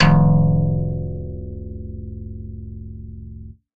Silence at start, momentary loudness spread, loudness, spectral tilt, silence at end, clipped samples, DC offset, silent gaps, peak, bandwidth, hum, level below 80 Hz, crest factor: 0 s; 21 LU; -19 LUFS; -8.5 dB/octave; 0.25 s; under 0.1%; under 0.1%; none; -2 dBFS; 5.2 kHz; none; -30 dBFS; 18 dB